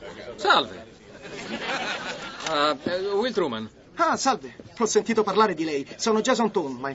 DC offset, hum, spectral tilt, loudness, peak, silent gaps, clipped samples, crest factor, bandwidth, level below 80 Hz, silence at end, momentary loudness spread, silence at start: under 0.1%; none; -3 dB/octave; -25 LUFS; -6 dBFS; none; under 0.1%; 20 dB; 8 kHz; -62 dBFS; 0 s; 15 LU; 0 s